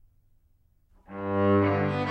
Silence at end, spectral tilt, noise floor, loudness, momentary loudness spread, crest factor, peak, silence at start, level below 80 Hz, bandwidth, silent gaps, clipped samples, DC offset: 0 s; -9 dB/octave; -64 dBFS; -25 LUFS; 15 LU; 16 dB; -12 dBFS; 1.1 s; -60 dBFS; 6 kHz; none; under 0.1%; under 0.1%